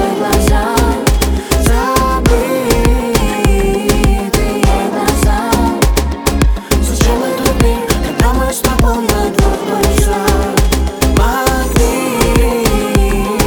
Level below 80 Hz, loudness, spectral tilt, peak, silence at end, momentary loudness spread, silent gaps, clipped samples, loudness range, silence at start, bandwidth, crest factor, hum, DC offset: -16 dBFS; -13 LUFS; -5 dB/octave; 0 dBFS; 0 s; 2 LU; none; under 0.1%; 1 LU; 0 s; over 20 kHz; 12 dB; none; under 0.1%